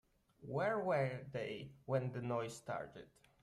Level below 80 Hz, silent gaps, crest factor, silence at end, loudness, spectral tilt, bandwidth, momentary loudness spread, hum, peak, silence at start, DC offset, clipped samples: -74 dBFS; none; 18 dB; 0.35 s; -41 LUFS; -6.5 dB/octave; 13 kHz; 13 LU; none; -24 dBFS; 0.4 s; under 0.1%; under 0.1%